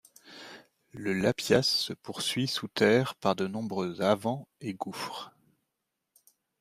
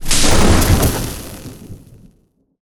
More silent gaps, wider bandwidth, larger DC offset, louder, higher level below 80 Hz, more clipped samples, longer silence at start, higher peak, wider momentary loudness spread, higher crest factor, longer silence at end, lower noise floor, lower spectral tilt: neither; second, 15.5 kHz vs over 20 kHz; neither; second, -29 LUFS vs -14 LUFS; second, -68 dBFS vs -20 dBFS; neither; first, 0.25 s vs 0 s; second, -10 dBFS vs 0 dBFS; about the same, 22 LU vs 22 LU; first, 22 dB vs 14 dB; first, 1.3 s vs 0.85 s; first, -84 dBFS vs -58 dBFS; about the same, -4.5 dB/octave vs -4 dB/octave